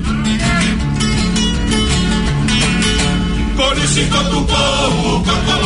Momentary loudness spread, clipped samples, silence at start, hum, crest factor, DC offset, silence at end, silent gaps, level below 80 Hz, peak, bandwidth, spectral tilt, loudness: 3 LU; under 0.1%; 0 s; none; 12 dB; under 0.1%; 0 s; none; -22 dBFS; -2 dBFS; 11 kHz; -4 dB/octave; -14 LUFS